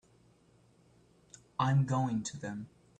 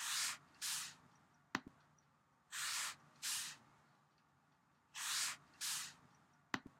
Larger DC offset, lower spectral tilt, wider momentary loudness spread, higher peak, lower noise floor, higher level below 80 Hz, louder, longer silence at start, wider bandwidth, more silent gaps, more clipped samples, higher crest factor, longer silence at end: neither; first, -6 dB/octave vs 0.5 dB/octave; about the same, 13 LU vs 11 LU; first, -16 dBFS vs -22 dBFS; second, -66 dBFS vs -76 dBFS; first, -68 dBFS vs -86 dBFS; first, -33 LUFS vs -44 LUFS; first, 1.6 s vs 0 s; second, 9.4 kHz vs 16 kHz; neither; neither; second, 20 dB vs 26 dB; first, 0.3 s vs 0.1 s